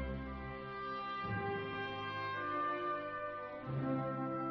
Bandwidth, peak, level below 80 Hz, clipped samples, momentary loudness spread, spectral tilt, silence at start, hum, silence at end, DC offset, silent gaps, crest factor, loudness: 6.2 kHz; -26 dBFS; -56 dBFS; under 0.1%; 7 LU; -4.5 dB/octave; 0 s; none; 0 s; under 0.1%; none; 14 dB; -40 LUFS